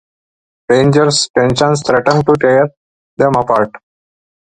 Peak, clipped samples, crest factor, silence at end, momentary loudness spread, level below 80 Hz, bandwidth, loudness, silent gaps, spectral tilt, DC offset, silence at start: 0 dBFS; under 0.1%; 14 dB; 0.7 s; 5 LU; -44 dBFS; 10.5 kHz; -12 LUFS; 1.30-1.34 s, 2.77-3.17 s; -5 dB/octave; under 0.1%; 0.7 s